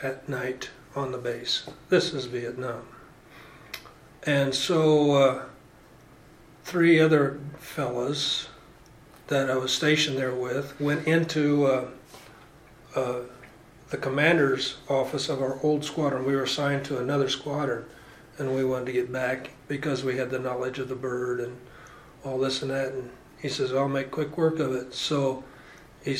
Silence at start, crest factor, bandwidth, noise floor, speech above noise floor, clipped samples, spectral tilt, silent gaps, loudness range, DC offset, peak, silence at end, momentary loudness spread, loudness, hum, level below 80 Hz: 0 s; 20 dB; 16 kHz; -52 dBFS; 26 dB; under 0.1%; -5 dB/octave; none; 5 LU; under 0.1%; -8 dBFS; 0 s; 16 LU; -26 LUFS; none; -60 dBFS